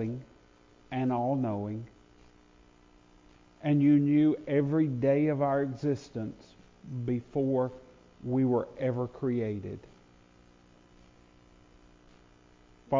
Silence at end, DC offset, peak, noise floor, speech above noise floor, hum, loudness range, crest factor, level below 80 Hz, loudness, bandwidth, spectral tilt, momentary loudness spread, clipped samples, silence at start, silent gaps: 0 s; under 0.1%; -14 dBFS; -60 dBFS; 31 dB; none; 9 LU; 16 dB; -62 dBFS; -29 LUFS; 7.4 kHz; -9.5 dB/octave; 16 LU; under 0.1%; 0 s; none